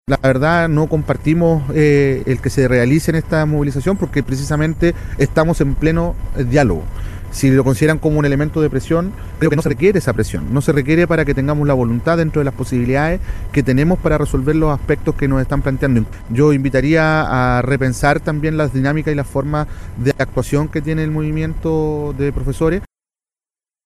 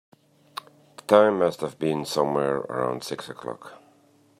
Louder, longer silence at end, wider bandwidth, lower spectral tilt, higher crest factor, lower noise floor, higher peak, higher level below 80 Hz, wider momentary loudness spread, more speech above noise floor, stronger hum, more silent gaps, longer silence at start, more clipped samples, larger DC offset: first, -16 LUFS vs -24 LUFS; first, 1 s vs 0.65 s; about the same, 13.5 kHz vs 14.5 kHz; first, -7.5 dB/octave vs -5.5 dB/octave; second, 14 dB vs 22 dB; first, under -90 dBFS vs -59 dBFS; about the same, 0 dBFS vs -2 dBFS; first, -28 dBFS vs -68 dBFS; second, 6 LU vs 22 LU; first, over 75 dB vs 35 dB; neither; neither; second, 0.1 s vs 1.1 s; neither; neither